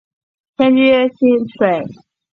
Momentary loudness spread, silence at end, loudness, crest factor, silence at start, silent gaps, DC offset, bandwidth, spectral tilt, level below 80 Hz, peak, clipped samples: 14 LU; 0.4 s; -14 LUFS; 14 dB; 0.6 s; none; under 0.1%; 4.5 kHz; -8 dB/octave; -58 dBFS; -2 dBFS; under 0.1%